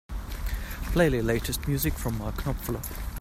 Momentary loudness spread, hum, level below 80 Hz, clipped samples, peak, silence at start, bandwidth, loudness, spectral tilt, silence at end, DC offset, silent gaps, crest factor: 11 LU; none; -34 dBFS; under 0.1%; -10 dBFS; 0.1 s; 16 kHz; -29 LUFS; -5.5 dB/octave; 0 s; under 0.1%; none; 20 dB